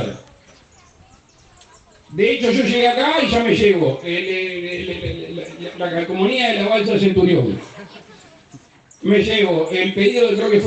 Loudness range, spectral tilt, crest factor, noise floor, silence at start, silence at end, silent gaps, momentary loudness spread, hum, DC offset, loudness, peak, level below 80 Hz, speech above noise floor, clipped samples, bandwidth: 3 LU; -6 dB/octave; 16 dB; -50 dBFS; 0 s; 0 s; none; 14 LU; none; under 0.1%; -17 LUFS; -2 dBFS; -50 dBFS; 33 dB; under 0.1%; 8.6 kHz